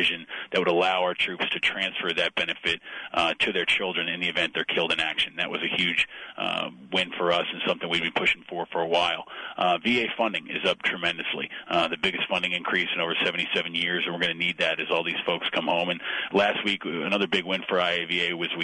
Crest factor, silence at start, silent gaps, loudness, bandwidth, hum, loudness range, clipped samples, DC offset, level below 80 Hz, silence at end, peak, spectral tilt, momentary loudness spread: 16 dB; 0 s; none; -25 LUFS; 10.5 kHz; none; 1 LU; under 0.1%; under 0.1%; -64 dBFS; 0 s; -10 dBFS; -4 dB/octave; 5 LU